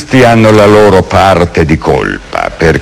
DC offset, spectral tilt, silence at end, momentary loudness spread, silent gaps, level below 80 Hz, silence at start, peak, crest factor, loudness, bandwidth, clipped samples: under 0.1%; -6.5 dB/octave; 0 s; 10 LU; none; -28 dBFS; 0 s; 0 dBFS; 6 dB; -6 LUFS; 15.5 kHz; 10%